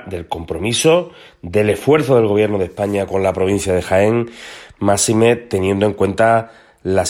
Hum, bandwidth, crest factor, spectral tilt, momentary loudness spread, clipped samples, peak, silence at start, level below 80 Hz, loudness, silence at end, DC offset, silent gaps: none; 16.5 kHz; 16 dB; -5 dB/octave; 14 LU; under 0.1%; 0 dBFS; 0 s; -48 dBFS; -16 LUFS; 0 s; under 0.1%; none